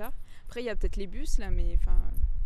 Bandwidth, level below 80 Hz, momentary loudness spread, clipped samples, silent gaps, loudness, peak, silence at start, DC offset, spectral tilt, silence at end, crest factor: 12.5 kHz; -26 dBFS; 10 LU; under 0.1%; none; -35 LUFS; -12 dBFS; 0 s; under 0.1%; -6 dB/octave; 0 s; 14 dB